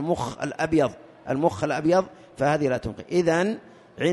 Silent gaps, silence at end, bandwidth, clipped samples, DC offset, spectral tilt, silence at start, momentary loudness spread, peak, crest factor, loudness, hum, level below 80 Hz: none; 0 s; 11.5 kHz; under 0.1%; under 0.1%; -6 dB/octave; 0 s; 8 LU; -8 dBFS; 16 dB; -25 LUFS; none; -54 dBFS